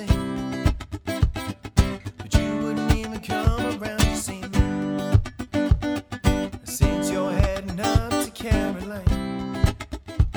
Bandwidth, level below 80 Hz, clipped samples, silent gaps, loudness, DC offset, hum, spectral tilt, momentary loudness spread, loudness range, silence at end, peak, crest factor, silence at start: over 20 kHz; -28 dBFS; under 0.1%; none; -25 LUFS; under 0.1%; none; -6 dB/octave; 6 LU; 1 LU; 0 s; -4 dBFS; 20 dB; 0 s